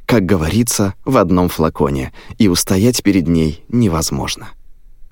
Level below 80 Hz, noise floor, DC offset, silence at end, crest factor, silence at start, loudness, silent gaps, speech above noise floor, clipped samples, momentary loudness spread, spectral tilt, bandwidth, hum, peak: -32 dBFS; -36 dBFS; under 0.1%; 0.05 s; 14 dB; 0 s; -15 LUFS; none; 21 dB; under 0.1%; 8 LU; -5 dB/octave; 17 kHz; none; 0 dBFS